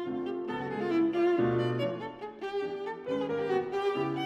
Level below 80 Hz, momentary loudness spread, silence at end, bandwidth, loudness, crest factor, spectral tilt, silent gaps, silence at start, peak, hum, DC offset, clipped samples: -66 dBFS; 10 LU; 0 s; 7.6 kHz; -31 LUFS; 14 dB; -7.5 dB/octave; none; 0 s; -16 dBFS; none; under 0.1%; under 0.1%